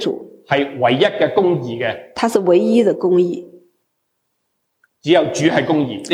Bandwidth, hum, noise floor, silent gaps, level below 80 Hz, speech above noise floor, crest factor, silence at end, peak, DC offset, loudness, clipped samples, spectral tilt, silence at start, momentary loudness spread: 13 kHz; none; -71 dBFS; none; -64 dBFS; 56 dB; 16 dB; 0 s; -2 dBFS; under 0.1%; -16 LUFS; under 0.1%; -5.5 dB/octave; 0 s; 9 LU